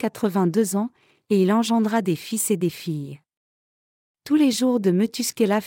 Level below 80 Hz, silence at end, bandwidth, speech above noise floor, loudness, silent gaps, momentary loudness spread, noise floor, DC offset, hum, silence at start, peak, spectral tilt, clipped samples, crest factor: -72 dBFS; 0 s; 17 kHz; over 69 dB; -22 LUFS; 3.37-4.15 s; 10 LU; under -90 dBFS; under 0.1%; none; 0 s; -8 dBFS; -5 dB/octave; under 0.1%; 14 dB